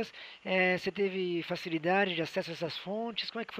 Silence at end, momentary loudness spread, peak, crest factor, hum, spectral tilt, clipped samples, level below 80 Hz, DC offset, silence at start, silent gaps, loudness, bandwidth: 0 s; 8 LU; -14 dBFS; 20 dB; none; -5.5 dB/octave; under 0.1%; -74 dBFS; under 0.1%; 0 s; none; -32 LUFS; 15.5 kHz